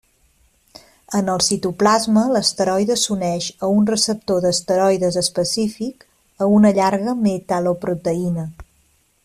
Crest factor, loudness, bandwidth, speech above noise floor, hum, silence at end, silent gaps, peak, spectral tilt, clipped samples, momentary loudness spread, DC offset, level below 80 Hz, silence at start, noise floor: 16 dB; -18 LUFS; 14 kHz; 42 dB; none; 0.6 s; none; -2 dBFS; -4.5 dB/octave; under 0.1%; 8 LU; under 0.1%; -52 dBFS; 1.1 s; -60 dBFS